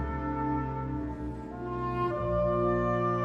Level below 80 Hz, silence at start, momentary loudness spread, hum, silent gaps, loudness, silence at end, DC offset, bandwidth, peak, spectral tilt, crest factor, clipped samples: -42 dBFS; 0 s; 10 LU; none; none; -31 LUFS; 0 s; under 0.1%; 7 kHz; -18 dBFS; -9.5 dB/octave; 12 dB; under 0.1%